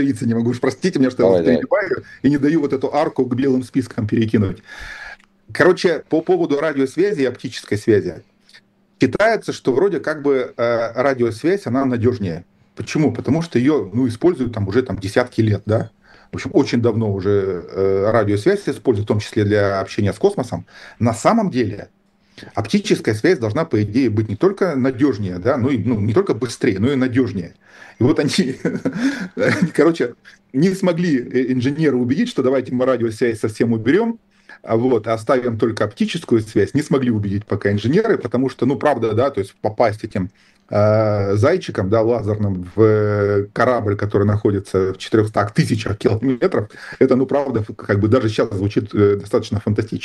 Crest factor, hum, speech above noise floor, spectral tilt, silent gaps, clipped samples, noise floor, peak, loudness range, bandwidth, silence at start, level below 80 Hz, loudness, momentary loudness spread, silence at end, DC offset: 18 dB; none; 33 dB; -7 dB/octave; none; under 0.1%; -51 dBFS; 0 dBFS; 2 LU; 12.5 kHz; 0 s; -52 dBFS; -18 LUFS; 7 LU; 0 s; under 0.1%